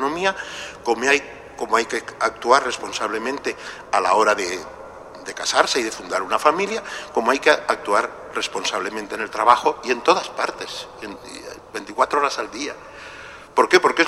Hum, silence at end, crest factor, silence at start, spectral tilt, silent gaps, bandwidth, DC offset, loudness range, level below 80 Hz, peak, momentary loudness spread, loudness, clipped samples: none; 0 s; 22 dB; 0 s; -2 dB/octave; none; 15.5 kHz; under 0.1%; 3 LU; -56 dBFS; 0 dBFS; 18 LU; -21 LUFS; under 0.1%